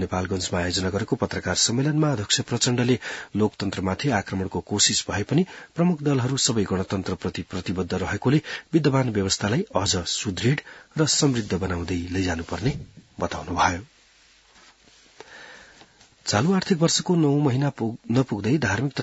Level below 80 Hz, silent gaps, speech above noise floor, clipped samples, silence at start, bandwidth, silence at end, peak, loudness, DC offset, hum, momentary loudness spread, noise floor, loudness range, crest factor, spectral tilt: -52 dBFS; none; 33 dB; under 0.1%; 0 s; 8.2 kHz; 0 s; -4 dBFS; -24 LUFS; under 0.1%; none; 9 LU; -56 dBFS; 6 LU; 20 dB; -4.5 dB/octave